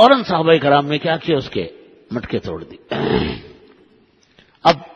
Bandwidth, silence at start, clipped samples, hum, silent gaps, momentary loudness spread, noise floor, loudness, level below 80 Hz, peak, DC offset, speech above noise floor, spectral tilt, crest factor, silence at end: 8.2 kHz; 0 s; under 0.1%; none; none; 16 LU; -54 dBFS; -18 LUFS; -46 dBFS; 0 dBFS; under 0.1%; 38 dB; -6.5 dB/octave; 18 dB; 0.1 s